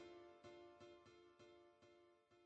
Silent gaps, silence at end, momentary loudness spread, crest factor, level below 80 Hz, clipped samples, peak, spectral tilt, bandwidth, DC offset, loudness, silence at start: none; 0 s; 6 LU; 16 dB; under -90 dBFS; under 0.1%; -48 dBFS; -5 dB/octave; 8.4 kHz; under 0.1%; -65 LUFS; 0 s